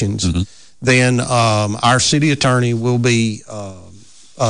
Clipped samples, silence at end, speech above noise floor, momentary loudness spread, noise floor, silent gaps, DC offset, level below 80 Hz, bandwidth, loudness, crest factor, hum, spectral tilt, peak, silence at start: under 0.1%; 0 s; 28 dB; 15 LU; -44 dBFS; none; 0.7%; -36 dBFS; 10.5 kHz; -15 LUFS; 12 dB; none; -4.5 dB/octave; -4 dBFS; 0 s